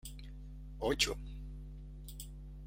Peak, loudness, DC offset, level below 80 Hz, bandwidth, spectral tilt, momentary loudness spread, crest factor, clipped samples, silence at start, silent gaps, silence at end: -14 dBFS; -38 LUFS; under 0.1%; -48 dBFS; 16.5 kHz; -3 dB/octave; 19 LU; 26 dB; under 0.1%; 0.05 s; none; 0 s